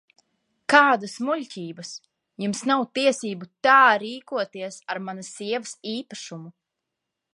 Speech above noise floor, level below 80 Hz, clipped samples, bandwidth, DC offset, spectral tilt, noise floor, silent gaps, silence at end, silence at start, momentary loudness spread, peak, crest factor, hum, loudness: 60 dB; -78 dBFS; under 0.1%; 11.5 kHz; under 0.1%; -3.5 dB/octave; -83 dBFS; none; 0.85 s; 0.7 s; 20 LU; -2 dBFS; 24 dB; none; -22 LUFS